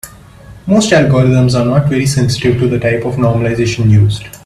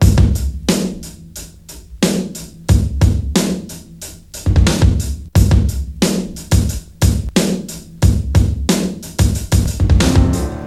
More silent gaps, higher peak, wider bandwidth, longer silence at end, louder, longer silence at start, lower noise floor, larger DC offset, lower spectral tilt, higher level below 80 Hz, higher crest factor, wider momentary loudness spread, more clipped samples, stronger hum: neither; about the same, 0 dBFS vs 0 dBFS; about the same, 14 kHz vs 15 kHz; about the same, 0.1 s vs 0 s; first, -11 LUFS vs -16 LUFS; about the same, 0.05 s vs 0 s; about the same, -35 dBFS vs -36 dBFS; second, under 0.1% vs 0.3%; about the same, -6.5 dB/octave vs -5.5 dB/octave; second, -36 dBFS vs -20 dBFS; about the same, 12 dB vs 14 dB; second, 5 LU vs 18 LU; neither; neither